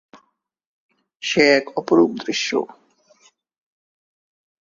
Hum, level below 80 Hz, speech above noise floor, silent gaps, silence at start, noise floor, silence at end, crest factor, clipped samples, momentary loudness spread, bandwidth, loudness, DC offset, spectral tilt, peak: none; -68 dBFS; 49 dB; none; 1.2 s; -67 dBFS; 2.05 s; 22 dB; under 0.1%; 11 LU; 7.6 kHz; -19 LUFS; under 0.1%; -3.5 dB/octave; -2 dBFS